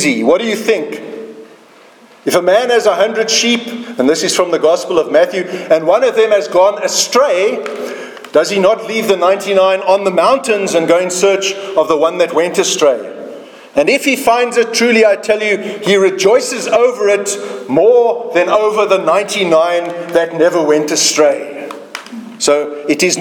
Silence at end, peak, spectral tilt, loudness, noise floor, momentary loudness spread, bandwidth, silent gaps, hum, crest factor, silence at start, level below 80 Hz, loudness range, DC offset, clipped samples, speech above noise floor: 0 s; 0 dBFS; -2.5 dB/octave; -12 LUFS; -42 dBFS; 11 LU; 19 kHz; none; none; 12 dB; 0 s; -60 dBFS; 2 LU; under 0.1%; under 0.1%; 30 dB